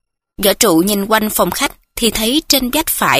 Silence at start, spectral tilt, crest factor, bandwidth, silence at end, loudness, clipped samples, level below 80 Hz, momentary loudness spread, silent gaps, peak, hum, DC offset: 0.4 s; -2.5 dB/octave; 14 dB; 16 kHz; 0 s; -14 LUFS; under 0.1%; -38 dBFS; 5 LU; none; 0 dBFS; none; under 0.1%